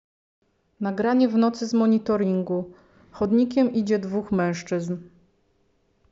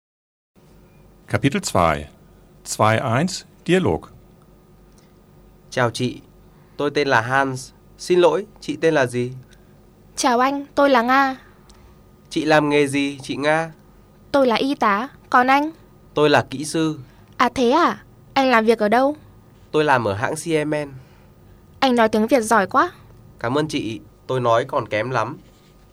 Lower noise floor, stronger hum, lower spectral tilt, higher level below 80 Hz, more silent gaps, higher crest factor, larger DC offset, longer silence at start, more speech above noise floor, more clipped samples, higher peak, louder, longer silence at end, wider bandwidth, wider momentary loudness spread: first, -67 dBFS vs -50 dBFS; second, none vs 50 Hz at -55 dBFS; first, -7 dB/octave vs -5 dB/octave; second, -60 dBFS vs -52 dBFS; neither; about the same, 14 dB vs 18 dB; neither; second, 0.8 s vs 1.3 s; first, 44 dB vs 31 dB; neither; second, -10 dBFS vs -2 dBFS; second, -23 LUFS vs -20 LUFS; first, 1.05 s vs 0.55 s; second, 7.6 kHz vs over 20 kHz; second, 10 LU vs 13 LU